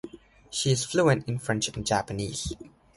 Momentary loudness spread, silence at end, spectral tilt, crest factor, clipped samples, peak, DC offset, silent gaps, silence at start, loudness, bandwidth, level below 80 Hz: 12 LU; 0.3 s; -4.5 dB/octave; 20 dB; under 0.1%; -8 dBFS; under 0.1%; none; 0.05 s; -27 LUFS; 11.5 kHz; -50 dBFS